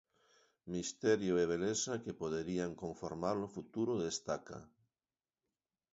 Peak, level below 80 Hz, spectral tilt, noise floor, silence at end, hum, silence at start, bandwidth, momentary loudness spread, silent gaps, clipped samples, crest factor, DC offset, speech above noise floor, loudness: -20 dBFS; -68 dBFS; -5 dB/octave; under -90 dBFS; 1.25 s; none; 0.65 s; 7.6 kHz; 10 LU; none; under 0.1%; 20 dB; under 0.1%; over 52 dB; -38 LUFS